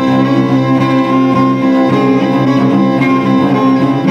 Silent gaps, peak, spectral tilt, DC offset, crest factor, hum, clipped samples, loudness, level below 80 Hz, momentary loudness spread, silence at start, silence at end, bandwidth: none; 0 dBFS; -8 dB/octave; under 0.1%; 10 dB; none; under 0.1%; -10 LUFS; -50 dBFS; 1 LU; 0 s; 0 s; 7 kHz